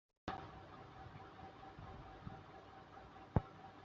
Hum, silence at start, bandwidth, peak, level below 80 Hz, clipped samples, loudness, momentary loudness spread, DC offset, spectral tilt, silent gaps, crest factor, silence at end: none; 0.25 s; 7.4 kHz; -18 dBFS; -60 dBFS; under 0.1%; -50 LUFS; 16 LU; under 0.1%; -6.5 dB/octave; none; 32 dB; 0 s